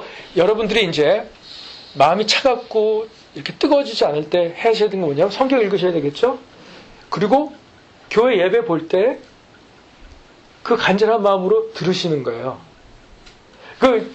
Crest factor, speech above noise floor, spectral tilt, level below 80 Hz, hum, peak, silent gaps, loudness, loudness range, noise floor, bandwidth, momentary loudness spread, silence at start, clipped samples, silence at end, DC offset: 18 dB; 30 dB; -5 dB/octave; -52 dBFS; none; 0 dBFS; none; -17 LUFS; 2 LU; -47 dBFS; 8.6 kHz; 14 LU; 0 s; under 0.1%; 0 s; under 0.1%